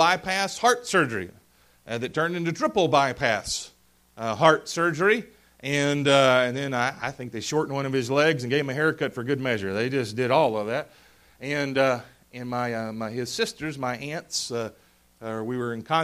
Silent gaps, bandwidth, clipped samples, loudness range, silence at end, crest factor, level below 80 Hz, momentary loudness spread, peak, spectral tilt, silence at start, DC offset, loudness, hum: none; 15.5 kHz; under 0.1%; 6 LU; 0 s; 22 dB; -60 dBFS; 12 LU; -2 dBFS; -4.5 dB/octave; 0 s; under 0.1%; -25 LUFS; none